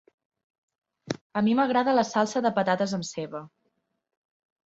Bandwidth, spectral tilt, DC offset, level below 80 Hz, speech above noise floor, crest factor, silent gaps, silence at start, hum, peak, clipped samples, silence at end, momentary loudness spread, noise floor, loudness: 8 kHz; -5 dB/octave; under 0.1%; -70 dBFS; 51 dB; 18 dB; 1.21-1.30 s; 1.05 s; none; -10 dBFS; under 0.1%; 1.2 s; 14 LU; -76 dBFS; -25 LUFS